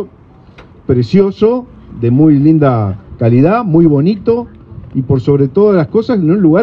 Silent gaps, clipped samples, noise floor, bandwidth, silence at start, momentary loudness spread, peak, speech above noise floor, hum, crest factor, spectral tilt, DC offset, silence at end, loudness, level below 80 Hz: none; under 0.1%; -40 dBFS; 6 kHz; 0 s; 11 LU; 0 dBFS; 30 dB; none; 10 dB; -10.5 dB/octave; under 0.1%; 0 s; -11 LUFS; -40 dBFS